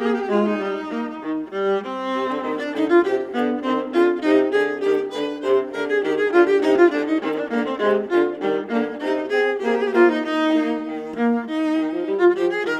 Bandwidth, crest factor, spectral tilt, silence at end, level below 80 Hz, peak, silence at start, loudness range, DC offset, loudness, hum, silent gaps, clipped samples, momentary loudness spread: 9 kHz; 16 dB; -6 dB/octave; 0 s; -64 dBFS; -4 dBFS; 0 s; 3 LU; under 0.1%; -21 LUFS; none; none; under 0.1%; 8 LU